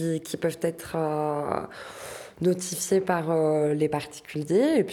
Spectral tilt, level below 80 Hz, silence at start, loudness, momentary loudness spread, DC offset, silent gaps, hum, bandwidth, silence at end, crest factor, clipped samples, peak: -5.5 dB/octave; -62 dBFS; 0 s; -26 LUFS; 13 LU; under 0.1%; none; none; 18.5 kHz; 0 s; 18 dB; under 0.1%; -8 dBFS